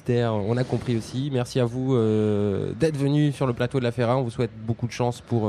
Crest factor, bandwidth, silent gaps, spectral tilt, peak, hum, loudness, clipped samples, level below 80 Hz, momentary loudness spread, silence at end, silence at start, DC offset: 14 dB; 12 kHz; none; -7.5 dB/octave; -8 dBFS; none; -24 LUFS; under 0.1%; -52 dBFS; 6 LU; 0 s; 0.05 s; under 0.1%